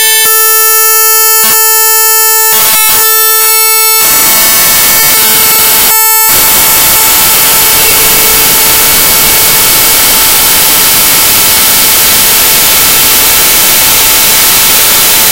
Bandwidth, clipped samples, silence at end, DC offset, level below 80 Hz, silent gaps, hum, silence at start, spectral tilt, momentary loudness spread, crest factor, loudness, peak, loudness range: over 20 kHz; 10%; 0 s; 3%; -32 dBFS; none; none; 0 s; 0.5 dB/octave; 1 LU; 4 dB; -2 LUFS; 0 dBFS; 0 LU